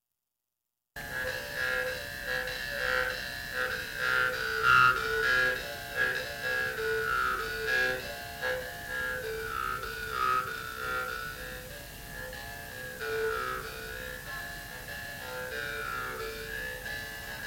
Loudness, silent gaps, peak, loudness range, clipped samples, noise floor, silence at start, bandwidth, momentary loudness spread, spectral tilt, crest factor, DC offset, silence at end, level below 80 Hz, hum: -31 LUFS; none; -10 dBFS; 10 LU; under 0.1%; -87 dBFS; 0.95 s; 17 kHz; 13 LU; -2.5 dB/octave; 22 dB; under 0.1%; 0 s; -52 dBFS; none